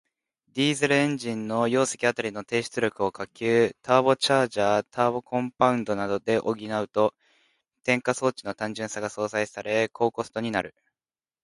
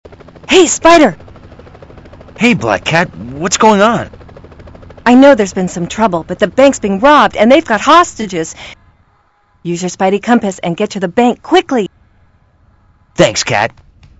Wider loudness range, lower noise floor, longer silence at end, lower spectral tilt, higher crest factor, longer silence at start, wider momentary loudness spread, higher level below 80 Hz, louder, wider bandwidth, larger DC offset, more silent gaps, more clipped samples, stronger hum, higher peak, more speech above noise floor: about the same, 4 LU vs 5 LU; first, under -90 dBFS vs -53 dBFS; first, 0.75 s vs 0.5 s; about the same, -4.5 dB/octave vs -4 dB/octave; first, 22 dB vs 12 dB; first, 0.55 s vs 0.1 s; second, 9 LU vs 13 LU; second, -66 dBFS vs -42 dBFS; second, -25 LUFS vs -10 LUFS; about the same, 11.5 kHz vs 11 kHz; neither; neither; second, under 0.1% vs 0.8%; neither; second, -4 dBFS vs 0 dBFS; first, over 65 dB vs 43 dB